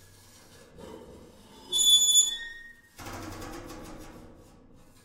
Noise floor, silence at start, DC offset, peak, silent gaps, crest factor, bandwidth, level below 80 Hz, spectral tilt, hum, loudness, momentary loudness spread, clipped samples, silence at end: -54 dBFS; 0.85 s; under 0.1%; -10 dBFS; none; 22 dB; 16 kHz; -54 dBFS; 1 dB/octave; none; -21 LUFS; 28 LU; under 0.1%; 0.85 s